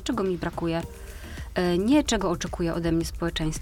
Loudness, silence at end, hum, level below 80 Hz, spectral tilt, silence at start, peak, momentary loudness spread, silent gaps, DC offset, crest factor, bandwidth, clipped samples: -26 LUFS; 0 s; none; -38 dBFS; -5 dB/octave; 0 s; -10 dBFS; 16 LU; none; under 0.1%; 16 dB; 17 kHz; under 0.1%